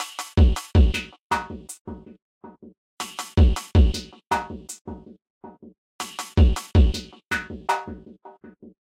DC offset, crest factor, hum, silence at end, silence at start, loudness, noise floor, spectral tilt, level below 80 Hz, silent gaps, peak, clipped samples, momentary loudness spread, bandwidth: under 0.1%; 16 dB; none; 0.55 s; 0 s; -23 LUFS; -47 dBFS; -5.5 dB/octave; -26 dBFS; 1.22-1.30 s, 1.81-1.85 s, 2.22-2.41 s, 2.77-2.98 s, 4.81-4.85 s, 5.30-5.41 s, 5.78-5.99 s; -8 dBFS; under 0.1%; 18 LU; 15 kHz